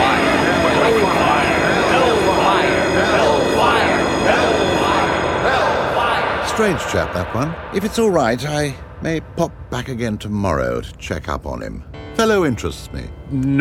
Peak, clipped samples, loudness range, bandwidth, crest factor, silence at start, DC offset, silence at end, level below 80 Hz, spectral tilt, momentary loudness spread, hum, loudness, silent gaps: -2 dBFS; under 0.1%; 7 LU; 16.5 kHz; 16 dB; 0 s; under 0.1%; 0 s; -36 dBFS; -5 dB/octave; 12 LU; none; -17 LUFS; none